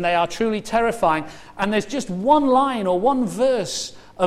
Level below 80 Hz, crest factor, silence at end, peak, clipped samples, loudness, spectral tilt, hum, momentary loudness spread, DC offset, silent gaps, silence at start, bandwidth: -48 dBFS; 18 dB; 0 s; -2 dBFS; under 0.1%; -20 LUFS; -4.5 dB/octave; none; 9 LU; under 0.1%; none; 0 s; 14.5 kHz